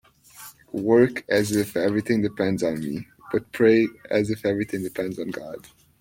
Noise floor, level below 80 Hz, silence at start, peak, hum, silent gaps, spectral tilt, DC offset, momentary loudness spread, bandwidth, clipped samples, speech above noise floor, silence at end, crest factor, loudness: -46 dBFS; -58 dBFS; 0.4 s; -6 dBFS; none; none; -6 dB/octave; under 0.1%; 16 LU; 16.5 kHz; under 0.1%; 24 dB; 0.4 s; 18 dB; -23 LUFS